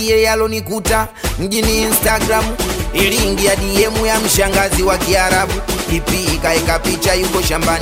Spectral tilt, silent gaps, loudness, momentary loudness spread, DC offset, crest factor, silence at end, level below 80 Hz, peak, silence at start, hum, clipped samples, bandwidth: -3.5 dB/octave; none; -14 LUFS; 6 LU; under 0.1%; 14 dB; 0 s; -24 dBFS; 0 dBFS; 0 s; none; under 0.1%; 16.5 kHz